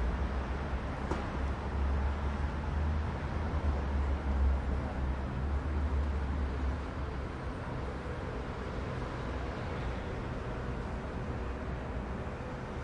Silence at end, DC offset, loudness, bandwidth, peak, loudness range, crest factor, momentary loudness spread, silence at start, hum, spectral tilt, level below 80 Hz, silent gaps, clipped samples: 0 s; under 0.1%; -36 LUFS; 8.2 kHz; -20 dBFS; 4 LU; 14 dB; 5 LU; 0 s; none; -7.5 dB/octave; -36 dBFS; none; under 0.1%